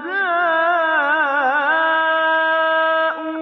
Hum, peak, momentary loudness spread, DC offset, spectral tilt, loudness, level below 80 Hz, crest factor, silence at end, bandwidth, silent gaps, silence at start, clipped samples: none; -6 dBFS; 2 LU; under 0.1%; 2.5 dB/octave; -16 LUFS; -76 dBFS; 12 dB; 0 s; 6 kHz; none; 0 s; under 0.1%